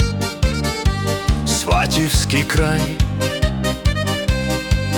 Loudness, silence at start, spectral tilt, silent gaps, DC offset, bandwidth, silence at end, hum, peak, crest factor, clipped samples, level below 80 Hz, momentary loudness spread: -19 LUFS; 0 s; -4.5 dB/octave; none; under 0.1%; 18 kHz; 0 s; none; -4 dBFS; 14 dB; under 0.1%; -24 dBFS; 4 LU